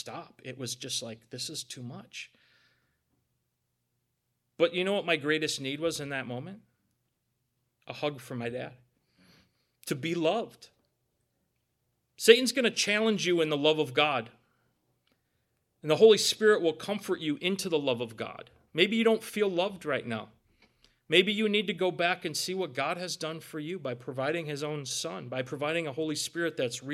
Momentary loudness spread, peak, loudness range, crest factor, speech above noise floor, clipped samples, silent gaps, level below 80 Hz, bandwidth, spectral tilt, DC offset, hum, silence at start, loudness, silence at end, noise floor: 17 LU; -4 dBFS; 13 LU; 28 dB; 51 dB; under 0.1%; none; -78 dBFS; 15.5 kHz; -3.5 dB/octave; under 0.1%; 60 Hz at -65 dBFS; 0 s; -29 LUFS; 0 s; -80 dBFS